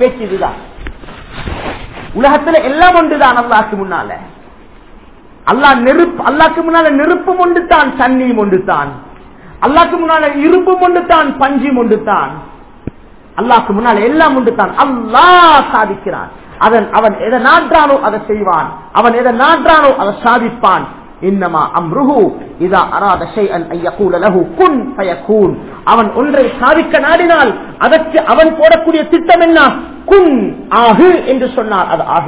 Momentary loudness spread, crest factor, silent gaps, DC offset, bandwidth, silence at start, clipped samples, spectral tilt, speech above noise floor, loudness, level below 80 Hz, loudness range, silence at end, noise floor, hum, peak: 12 LU; 10 dB; none; 0.8%; 4 kHz; 0 s; 3%; -9 dB/octave; 28 dB; -9 LUFS; -36 dBFS; 4 LU; 0 s; -37 dBFS; none; 0 dBFS